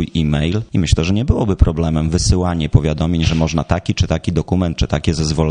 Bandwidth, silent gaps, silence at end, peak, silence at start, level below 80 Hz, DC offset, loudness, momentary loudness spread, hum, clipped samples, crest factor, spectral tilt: 10 kHz; none; 0 s; 0 dBFS; 0 s; -22 dBFS; under 0.1%; -17 LUFS; 3 LU; none; under 0.1%; 16 dB; -6 dB/octave